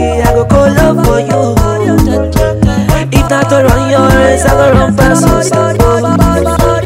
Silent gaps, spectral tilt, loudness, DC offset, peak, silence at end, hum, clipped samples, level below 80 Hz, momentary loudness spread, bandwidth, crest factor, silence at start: none; -6 dB/octave; -8 LUFS; under 0.1%; 0 dBFS; 0 s; none; 1%; -16 dBFS; 4 LU; 16.5 kHz; 8 dB; 0 s